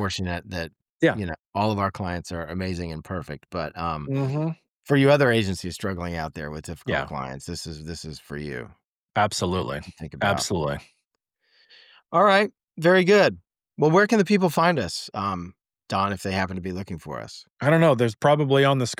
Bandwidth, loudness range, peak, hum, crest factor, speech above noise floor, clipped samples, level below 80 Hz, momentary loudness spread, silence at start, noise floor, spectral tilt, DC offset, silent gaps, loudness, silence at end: 16 kHz; 9 LU; -6 dBFS; none; 18 dB; 53 dB; under 0.1%; -50 dBFS; 16 LU; 0 s; -77 dBFS; -5.5 dB/octave; under 0.1%; 0.82-0.86 s, 0.92-0.98 s, 1.39-1.53 s, 4.71-4.80 s, 8.86-9.09 s, 11.07-11.11 s, 17.52-17.56 s; -23 LUFS; 0.05 s